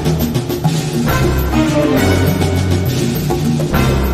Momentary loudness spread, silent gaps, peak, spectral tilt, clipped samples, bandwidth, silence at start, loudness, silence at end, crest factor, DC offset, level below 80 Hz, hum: 4 LU; none; -2 dBFS; -6 dB/octave; under 0.1%; 16 kHz; 0 s; -15 LUFS; 0 s; 12 dB; under 0.1%; -24 dBFS; none